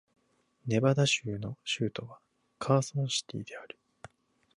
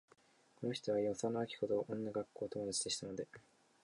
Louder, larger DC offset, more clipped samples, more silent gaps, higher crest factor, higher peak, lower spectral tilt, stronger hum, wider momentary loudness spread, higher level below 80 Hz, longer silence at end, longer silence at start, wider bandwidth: first, -30 LUFS vs -40 LUFS; neither; neither; neither; about the same, 22 dB vs 18 dB; first, -12 dBFS vs -24 dBFS; about the same, -4.5 dB/octave vs -4 dB/octave; neither; first, 19 LU vs 8 LU; first, -68 dBFS vs -76 dBFS; first, 0.9 s vs 0.45 s; about the same, 0.65 s vs 0.6 s; about the same, 11.5 kHz vs 11 kHz